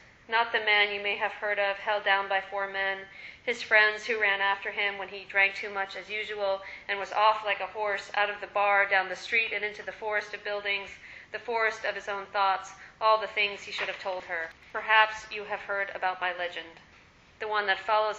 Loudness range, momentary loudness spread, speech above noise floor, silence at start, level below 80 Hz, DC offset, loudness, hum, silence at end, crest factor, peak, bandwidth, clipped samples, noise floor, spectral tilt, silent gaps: 3 LU; 12 LU; 28 dB; 0.3 s; -68 dBFS; under 0.1%; -28 LUFS; none; 0 s; 22 dB; -6 dBFS; 8.2 kHz; under 0.1%; -57 dBFS; -1.5 dB/octave; none